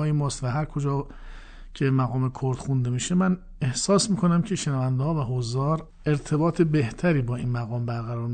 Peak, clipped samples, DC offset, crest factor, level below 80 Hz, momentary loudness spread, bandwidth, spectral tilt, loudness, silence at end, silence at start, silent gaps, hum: -8 dBFS; under 0.1%; under 0.1%; 16 dB; -44 dBFS; 7 LU; 9.4 kHz; -6 dB/octave; -25 LUFS; 0 s; 0 s; none; none